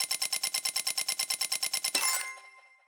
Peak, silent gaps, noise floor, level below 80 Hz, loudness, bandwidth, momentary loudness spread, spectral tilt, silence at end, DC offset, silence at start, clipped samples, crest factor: -10 dBFS; none; -55 dBFS; -80 dBFS; -29 LUFS; over 20 kHz; 5 LU; 3 dB/octave; 0.3 s; under 0.1%; 0 s; under 0.1%; 22 dB